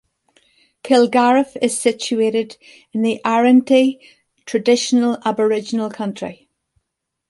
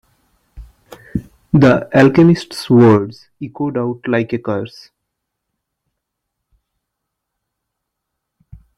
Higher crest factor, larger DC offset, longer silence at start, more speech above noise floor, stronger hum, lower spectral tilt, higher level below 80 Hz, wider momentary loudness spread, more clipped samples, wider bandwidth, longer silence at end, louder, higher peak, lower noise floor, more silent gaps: about the same, 16 dB vs 16 dB; neither; first, 0.85 s vs 0.55 s; about the same, 61 dB vs 64 dB; neither; second, -4 dB/octave vs -8 dB/octave; second, -66 dBFS vs -46 dBFS; second, 14 LU vs 18 LU; neither; about the same, 11.5 kHz vs 12.5 kHz; second, 0.95 s vs 4.1 s; second, -17 LUFS vs -14 LUFS; about the same, -2 dBFS vs 0 dBFS; about the same, -78 dBFS vs -77 dBFS; neither